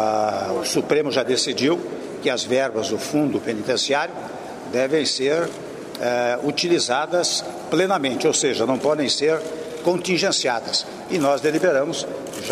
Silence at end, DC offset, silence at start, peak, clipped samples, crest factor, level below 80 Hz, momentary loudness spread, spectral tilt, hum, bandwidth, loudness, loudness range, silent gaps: 0 s; under 0.1%; 0 s; -6 dBFS; under 0.1%; 16 dB; -64 dBFS; 8 LU; -3 dB/octave; none; 15.5 kHz; -21 LUFS; 2 LU; none